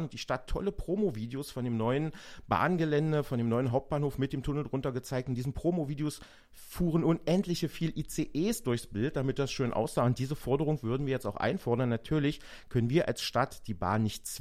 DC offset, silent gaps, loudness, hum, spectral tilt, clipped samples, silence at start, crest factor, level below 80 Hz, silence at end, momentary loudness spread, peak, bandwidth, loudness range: under 0.1%; none; -32 LUFS; none; -6.5 dB/octave; under 0.1%; 0 s; 18 dB; -50 dBFS; 0 s; 7 LU; -14 dBFS; 15.5 kHz; 2 LU